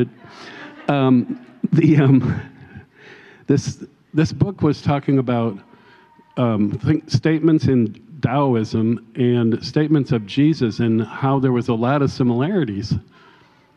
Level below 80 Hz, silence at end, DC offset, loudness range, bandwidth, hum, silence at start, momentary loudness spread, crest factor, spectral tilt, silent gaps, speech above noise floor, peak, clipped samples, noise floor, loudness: -48 dBFS; 0.75 s; under 0.1%; 3 LU; 8.4 kHz; none; 0 s; 12 LU; 16 dB; -8 dB/octave; none; 34 dB; -4 dBFS; under 0.1%; -51 dBFS; -19 LUFS